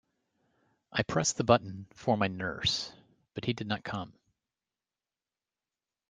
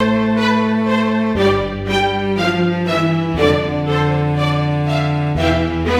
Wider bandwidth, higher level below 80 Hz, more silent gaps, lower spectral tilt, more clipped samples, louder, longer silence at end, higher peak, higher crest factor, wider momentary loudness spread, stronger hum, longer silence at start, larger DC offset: second, 10 kHz vs 13 kHz; second, -62 dBFS vs -38 dBFS; neither; second, -4 dB/octave vs -7 dB/octave; neither; second, -31 LUFS vs -16 LUFS; first, 2 s vs 0 s; second, -6 dBFS vs -2 dBFS; first, 28 dB vs 14 dB; first, 15 LU vs 2 LU; neither; first, 0.95 s vs 0 s; neither